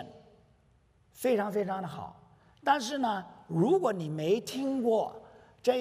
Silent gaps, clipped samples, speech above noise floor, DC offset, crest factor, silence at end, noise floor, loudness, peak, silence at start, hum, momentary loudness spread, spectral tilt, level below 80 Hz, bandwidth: none; under 0.1%; 36 dB; under 0.1%; 20 dB; 0 s; -65 dBFS; -31 LUFS; -12 dBFS; 0 s; none; 13 LU; -5.5 dB/octave; -72 dBFS; 15.5 kHz